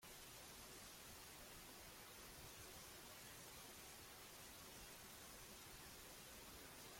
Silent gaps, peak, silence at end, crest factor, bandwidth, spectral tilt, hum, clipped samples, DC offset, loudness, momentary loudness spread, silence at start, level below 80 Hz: none; -46 dBFS; 0 s; 14 dB; 16.5 kHz; -2 dB/octave; none; under 0.1%; under 0.1%; -57 LUFS; 1 LU; 0 s; -72 dBFS